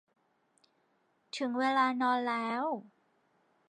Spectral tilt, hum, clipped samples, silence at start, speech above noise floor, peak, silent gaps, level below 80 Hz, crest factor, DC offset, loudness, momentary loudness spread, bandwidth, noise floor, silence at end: -4 dB/octave; none; under 0.1%; 1.35 s; 43 dB; -16 dBFS; none; -90 dBFS; 20 dB; under 0.1%; -32 LUFS; 10 LU; 10 kHz; -74 dBFS; 0.8 s